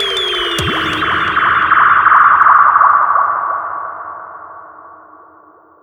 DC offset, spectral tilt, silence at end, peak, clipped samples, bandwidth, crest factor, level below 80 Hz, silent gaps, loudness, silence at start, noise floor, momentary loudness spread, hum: under 0.1%; -3 dB/octave; 0.9 s; 0 dBFS; under 0.1%; 15.5 kHz; 14 dB; -44 dBFS; none; -10 LUFS; 0 s; -44 dBFS; 19 LU; none